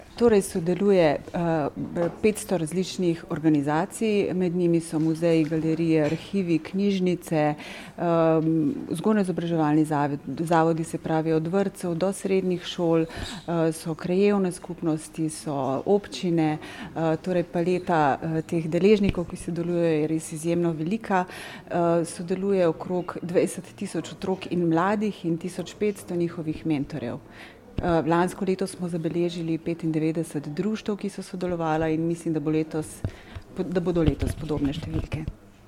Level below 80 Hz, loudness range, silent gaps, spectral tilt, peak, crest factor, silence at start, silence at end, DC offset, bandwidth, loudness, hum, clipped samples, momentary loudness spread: -46 dBFS; 4 LU; none; -6.5 dB/octave; -6 dBFS; 20 dB; 0 s; 0.2 s; under 0.1%; 15 kHz; -25 LUFS; none; under 0.1%; 9 LU